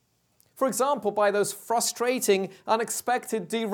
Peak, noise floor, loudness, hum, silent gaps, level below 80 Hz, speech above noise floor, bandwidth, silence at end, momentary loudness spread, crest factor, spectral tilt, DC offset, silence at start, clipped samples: -8 dBFS; -67 dBFS; -26 LUFS; none; none; -78 dBFS; 41 dB; 19 kHz; 0 s; 4 LU; 18 dB; -3 dB/octave; under 0.1%; 0.6 s; under 0.1%